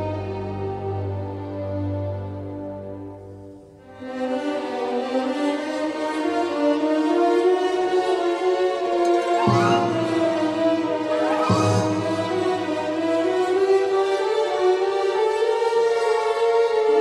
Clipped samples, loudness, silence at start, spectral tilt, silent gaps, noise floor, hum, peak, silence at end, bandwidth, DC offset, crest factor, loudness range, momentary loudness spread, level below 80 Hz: under 0.1%; -22 LUFS; 0 s; -6 dB/octave; none; -43 dBFS; none; -4 dBFS; 0 s; 12 kHz; under 0.1%; 16 dB; 9 LU; 11 LU; -60 dBFS